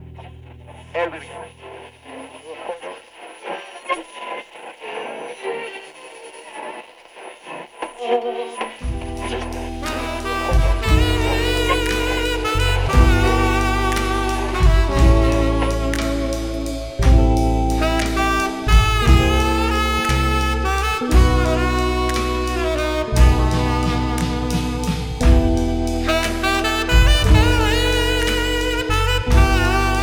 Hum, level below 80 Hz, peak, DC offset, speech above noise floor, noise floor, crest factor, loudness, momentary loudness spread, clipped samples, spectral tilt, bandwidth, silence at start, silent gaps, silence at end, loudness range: none; -20 dBFS; -2 dBFS; under 0.1%; 15 dB; -40 dBFS; 16 dB; -19 LUFS; 19 LU; under 0.1%; -5 dB/octave; 18 kHz; 0 s; none; 0 s; 14 LU